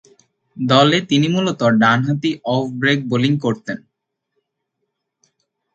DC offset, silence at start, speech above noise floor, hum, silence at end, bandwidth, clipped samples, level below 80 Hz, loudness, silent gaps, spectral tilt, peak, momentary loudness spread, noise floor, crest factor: under 0.1%; 0.55 s; 59 dB; none; 1.95 s; 7.8 kHz; under 0.1%; -60 dBFS; -17 LUFS; none; -6 dB/octave; 0 dBFS; 11 LU; -75 dBFS; 18 dB